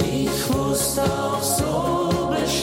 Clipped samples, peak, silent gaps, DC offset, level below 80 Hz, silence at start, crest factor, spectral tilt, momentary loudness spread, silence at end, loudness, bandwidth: under 0.1%; -8 dBFS; none; under 0.1%; -40 dBFS; 0 s; 14 dB; -4.5 dB/octave; 2 LU; 0 s; -22 LUFS; 16.5 kHz